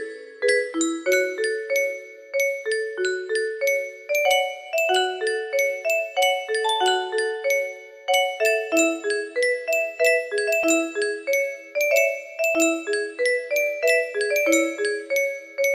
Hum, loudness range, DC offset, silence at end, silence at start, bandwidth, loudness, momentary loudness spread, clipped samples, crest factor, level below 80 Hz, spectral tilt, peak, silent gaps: none; 2 LU; under 0.1%; 0 s; 0 s; 15 kHz; -22 LUFS; 6 LU; under 0.1%; 16 dB; -72 dBFS; 0 dB/octave; -6 dBFS; none